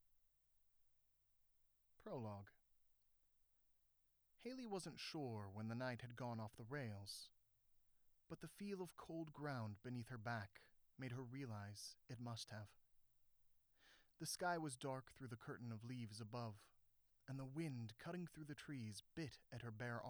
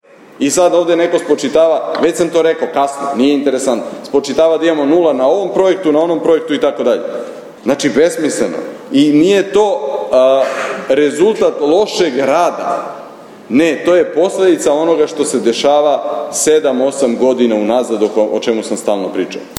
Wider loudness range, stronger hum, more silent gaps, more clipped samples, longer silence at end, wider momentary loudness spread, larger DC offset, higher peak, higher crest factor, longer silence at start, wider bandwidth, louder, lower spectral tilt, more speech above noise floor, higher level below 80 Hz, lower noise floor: first, 8 LU vs 1 LU; first, 60 Hz at -75 dBFS vs none; neither; neither; about the same, 0 s vs 0 s; about the same, 9 LU vs 7 LU; neither; second, -32 dBFS vs 0 dBFS; first, 22 dB vs 12 dB; first, 0.85 s vs 0.4 s; first, over 20 kHz vs 15 kHz; second, -52 LUFS vs -13 LUFS; about the same, -5 dB/octave vs -4 dB/octave; first, 30 dB vs 21 dB; second, -82 dBFS vs -56 dBFS; first, -82 dBFS vs -33 dBFS